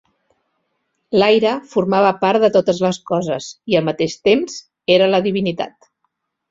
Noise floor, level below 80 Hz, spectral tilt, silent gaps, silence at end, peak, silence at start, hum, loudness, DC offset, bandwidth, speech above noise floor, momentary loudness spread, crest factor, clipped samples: -71 dBFS; -58 dBFS; -5.5 dB/octave; none; 0.8 s; -2 dBFS; 1.1 s; none; -17 LUFS; under 0.1%; 7.8 kHz; 55 dB; 11 LU; 16 dB; under 0.1%